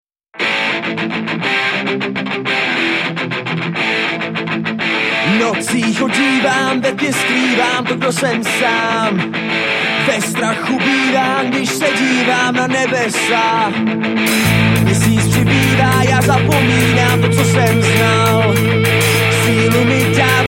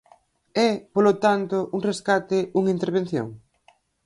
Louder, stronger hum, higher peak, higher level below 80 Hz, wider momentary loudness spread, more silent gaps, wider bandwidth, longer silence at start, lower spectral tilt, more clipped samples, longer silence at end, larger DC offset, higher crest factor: first, -14 LUFS vs -23 LUFS; neither; first, 0 dBFS vs -6 dBFS; first, -42 dBFS vs -66 dBFS; second, 6 LU vs 9 LU; neither; first, 16.5 kHz vs 11.5 kHz; second, 0.35 s vs 0.55 s; second, -4.5 dB/octave vs -6 dB/octave; neither; second, 0 s vs 0.65 s; neither; about the same, 14 dB vs 16 dB